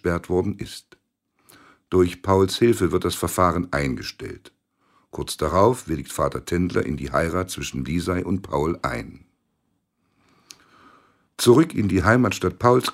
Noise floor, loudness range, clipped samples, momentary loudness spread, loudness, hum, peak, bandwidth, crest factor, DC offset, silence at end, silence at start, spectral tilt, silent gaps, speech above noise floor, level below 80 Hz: -72 dBFS; 6 LU; under 0.1%; 15 LU; -22 LUFS; none; -2 dBFS; 16 kHz; 22 dB; under 0.1%; 0 s; 0.05 s; -5.5 dB/octave; none; 51 dB; -44 dBFS